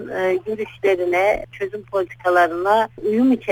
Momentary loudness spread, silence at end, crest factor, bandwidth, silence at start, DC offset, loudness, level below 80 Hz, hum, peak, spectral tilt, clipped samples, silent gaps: 8 LU; 0 s; 16 dB; 19 kHz; 0 s; under 0.1%; -20 LUFS; -52 dBFS; none; -4 dBFS; -5.5 dB/octave; under 0.1%; none